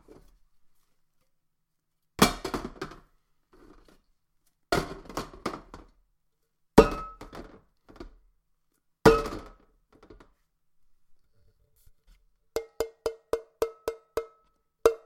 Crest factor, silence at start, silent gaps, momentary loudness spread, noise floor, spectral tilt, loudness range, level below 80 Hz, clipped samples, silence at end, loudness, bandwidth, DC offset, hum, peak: 32 dB; 2.2 s; none; 25 LU; -77 dBFS; -5 dB/octave; 12 LU; -46 dBFS; under 0.1%; 0.1 s; -28 LUFS; 16.5 kHz; under 0.1%; none; 0 dBFS